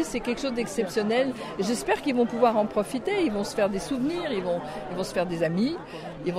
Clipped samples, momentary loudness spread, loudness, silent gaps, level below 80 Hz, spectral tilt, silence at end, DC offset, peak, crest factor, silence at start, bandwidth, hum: under 0.1%; 8 LU; -27 LUFS; none; -52 dBFS; -5 dB/octave; 0 s; under 0.1%; -8 dBFS; 18 dB; 0 s; 15.5 kHz; none